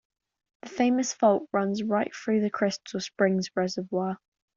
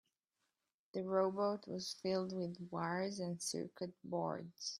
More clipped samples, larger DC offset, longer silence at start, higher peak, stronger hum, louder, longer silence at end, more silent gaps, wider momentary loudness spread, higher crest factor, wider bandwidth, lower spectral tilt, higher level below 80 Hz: neither; neither; second, 0.65 s vs 0.95 s; first, -8 dBFS vs -22 dBFS; neither; first, -27 LUFS vs -41 LUFS; first, 0.4 s vs 0 s; neither; about the same, 10 LU vs 8 LU; about the same, 18 dB vs 20 dB; second, 7.6 kHz vs 14.5 kHz; about the same, -5 dB/octave vs -4.5 dB/octave; first, -72 dBFS vs -84 dBFS